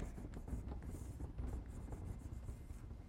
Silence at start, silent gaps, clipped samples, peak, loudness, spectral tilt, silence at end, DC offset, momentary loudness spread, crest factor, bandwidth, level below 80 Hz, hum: 0 s; none; under 0.1%; -34 dBFS; -50 LUFS; -7.5 dB/octave; 0 s; under 0.1%; 4 LU; 14 dB; 16 kHz; -50 dBFS; none